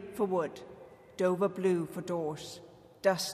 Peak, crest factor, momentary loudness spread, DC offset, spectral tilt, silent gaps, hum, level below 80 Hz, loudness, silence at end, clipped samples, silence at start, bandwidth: -16 dBFS; 18 dB; 20 LU; under 0.1%; -5 dB/octave; none; none; -72 dBFS; -32 LUFS; 0 s; under 0.1%; 0 s; 15.5 kHz